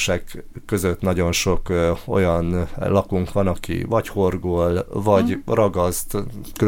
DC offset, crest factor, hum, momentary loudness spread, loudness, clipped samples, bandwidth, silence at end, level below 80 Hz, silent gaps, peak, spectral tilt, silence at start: under 0.1%; 16 dB; none; 8 LU; -21 LUFS; under 0.1%; 17 kHz; 0 s; -34 dBFS; none; -4 dBFS; -5.5 dB/octave; 0 s